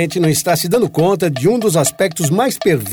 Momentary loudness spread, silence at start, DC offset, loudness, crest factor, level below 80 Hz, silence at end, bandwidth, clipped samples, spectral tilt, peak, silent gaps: 2 LU; 0 s; under 0.1%; -15 LUFS; 12 dB; -52 dBFS; 0 s; over 20 kHz; under 0.1%; -5 dB/octave; -2 dBFS; none